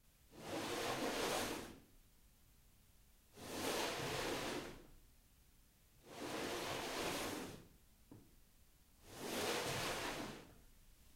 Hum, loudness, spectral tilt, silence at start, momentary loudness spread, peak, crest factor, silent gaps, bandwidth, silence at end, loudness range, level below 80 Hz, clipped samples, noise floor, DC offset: none; -43 LUFS; -3 dB/octave; 0.3 s; 22 LU; -28 dBFS; 18 dB; none; 16 kHz; 0 s; 2 LU; -66 dBFS; under 0.1%; -69 dBFS; under 0.1%